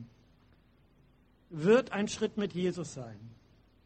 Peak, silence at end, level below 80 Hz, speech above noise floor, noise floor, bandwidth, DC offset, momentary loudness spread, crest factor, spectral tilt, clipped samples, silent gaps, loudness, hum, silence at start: -14 dBFS; 0.55 s; -66 dBFS; 34 dB; -65 dBFS; 8.4 kHz; under 0.1%; 20 LU; 20 dB; -5.5 dB/octave; under 0.1%; none; -31 LUFS; none; 0 s